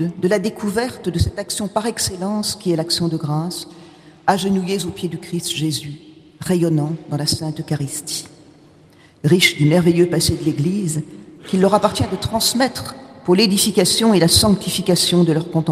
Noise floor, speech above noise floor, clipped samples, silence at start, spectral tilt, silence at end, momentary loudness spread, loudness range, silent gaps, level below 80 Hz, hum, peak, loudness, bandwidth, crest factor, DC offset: -48 dBFS; 31 dB; under 0.1%; 0 s; -4.5 dB/octave; 0 s; 13 LU; 7 LU; none; -42 dBFS; none; 0 dBFS; -18 LUFS; 15.5 kHz; 18 dB; under 0.1%